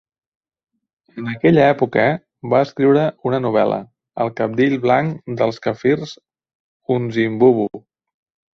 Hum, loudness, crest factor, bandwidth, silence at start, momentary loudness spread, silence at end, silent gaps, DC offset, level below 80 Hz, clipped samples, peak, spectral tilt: none; -18 LUFS; 18 dB; 6.6 kHz; 1.15 s; 12 LU; 0.75 s; 6.55-6.80 s; under 0.1%; -58 dBFS; under 0.1%; 0 dBFS; -8 dB/octave